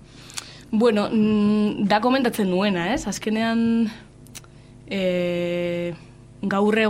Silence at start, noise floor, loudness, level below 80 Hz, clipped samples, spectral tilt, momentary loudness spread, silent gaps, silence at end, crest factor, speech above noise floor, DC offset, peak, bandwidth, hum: 0.15 s; -45 dBFS; -22 LUFS; -52 dBFS; under 0.1%; -5.5 dB/octave; 16 LU; none; 0 s; 16 dB; 25 dB; under 0.1%; -6 dBFS; 15.5 kHz; 50 Hz at -50 dBFS